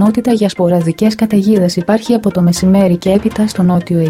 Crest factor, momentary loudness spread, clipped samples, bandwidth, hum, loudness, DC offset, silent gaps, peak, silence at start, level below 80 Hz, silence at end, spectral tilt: 12 dB; 3 LU; under 0.1%; 15.5 kHz; none; -12 LUFS; under 0.1%; none; 0 dBFS; 0 s; -40 dBFS; 0 s; -7 dB/octave